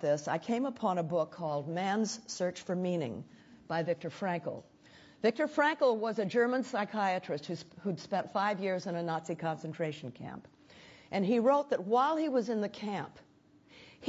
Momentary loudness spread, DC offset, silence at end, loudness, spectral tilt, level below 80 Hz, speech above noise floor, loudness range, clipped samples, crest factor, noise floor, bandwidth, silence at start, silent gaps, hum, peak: 12 LU; under 0.1%; 0 s; -33 LUFS; -5.5 dB/octave; -76 dBFS; 30 dB; 4 LU; under 0.1%; 18 dB; -62 dBFS; 8 kHz; 0 s; none; none; -16 dBFS